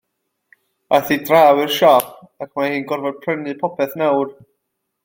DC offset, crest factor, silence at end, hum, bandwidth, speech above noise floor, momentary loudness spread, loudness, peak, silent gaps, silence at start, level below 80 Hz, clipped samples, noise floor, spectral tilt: under 0.1%; 18 dB; 0.75 s; none; 17 kHz; 58 dB; 13 LU; -17 LUFS; 0 dBFS; none; 0.9 s; -62 dBFS; under 0.1%; -75 dBFS; -4.5 dB/octave